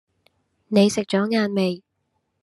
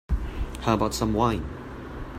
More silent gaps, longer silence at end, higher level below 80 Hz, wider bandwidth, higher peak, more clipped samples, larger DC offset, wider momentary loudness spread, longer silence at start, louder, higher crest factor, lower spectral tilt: neither; first, 0.65 s vs 0 s; second, -68 dBFS vs -34 dBFS; second, 12.5 kHz vs 16 kHz; first, -4 dBFS vs -8 dBFS; neither; neither; second, 7 LU vs 14 LU; first, 0.7 s vs 0.1 s; first, -21 LUFS vs -27 LUFS; about the same, 20 dB vs 18 dB; about the same, -5.5 dB/octave vs -6 dB/octave